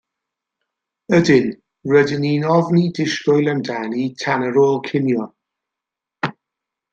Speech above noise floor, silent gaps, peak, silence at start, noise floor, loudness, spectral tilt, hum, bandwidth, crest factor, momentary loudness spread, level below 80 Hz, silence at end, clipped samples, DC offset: 68 dB; none; -2 dBFS; 1.1 s; -85 dBFS; -18 LUFS; -6.5 dB/octave; none; 7.8 kHz; 18 dB; 11 LU; -60 dBFS; 0.6 s; under 0.1%; under 0.1%